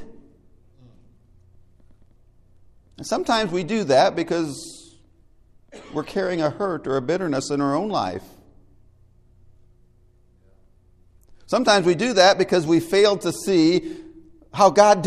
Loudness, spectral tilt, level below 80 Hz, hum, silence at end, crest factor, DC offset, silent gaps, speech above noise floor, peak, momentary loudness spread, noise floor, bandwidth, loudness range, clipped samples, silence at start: -20 LUFS; -4.5 dB/octave; -56 dBFS; none; 0 s; 22 dB; under 0.1%; none; 36 dB; -2 dBFS; 16 LU; -56 dBFS; 14.5 kHz; 11 LU; under 0.1%; 0 s